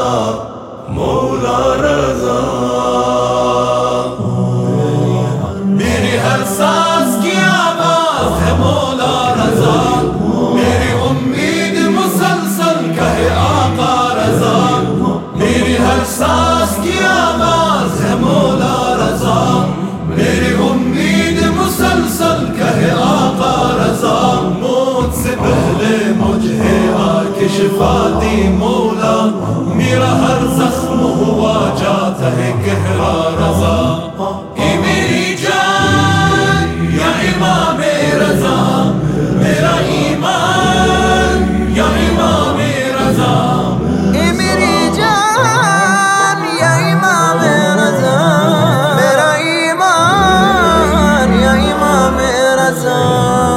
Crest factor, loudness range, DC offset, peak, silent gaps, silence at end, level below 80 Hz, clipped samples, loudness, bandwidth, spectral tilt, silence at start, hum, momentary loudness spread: 12 dB; 3 LU; under 0.1%; 0 dBFS; none; 0 s; -32 dBFS; under 0.1%; -12 LUFS; 16.5 kHz; -5 dB/octave; 0 s; none; 4 LU